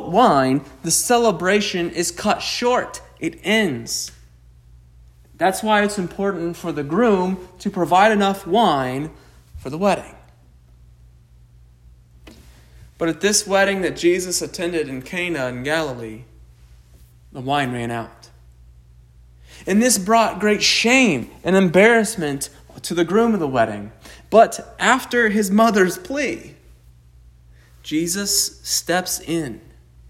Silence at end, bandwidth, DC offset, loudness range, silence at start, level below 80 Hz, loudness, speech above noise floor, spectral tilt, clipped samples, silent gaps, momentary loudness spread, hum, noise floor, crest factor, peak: 0.55 s; 16 kHz; under 0.1%; 10 LU; 0 s; -48 dBFS; -19 LUFS; 31 dB; -3.5 dB/octave; under 0.1%; none; 14 LU; none; -49 dBFS; 20 dB; 0 dBFS